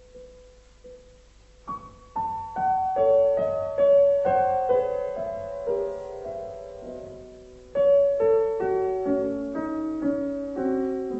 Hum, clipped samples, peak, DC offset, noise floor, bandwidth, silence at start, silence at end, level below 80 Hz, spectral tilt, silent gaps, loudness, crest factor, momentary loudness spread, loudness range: none; under 0.1%; -12 dBFS; under 0.1%; -53 dBFS; 7.8 kHz; 0.15 s; 0 s; -54 dBFS; -7.5 dB/octave; none; -24 LUFS; 14 dB; 18 LU; 6 LU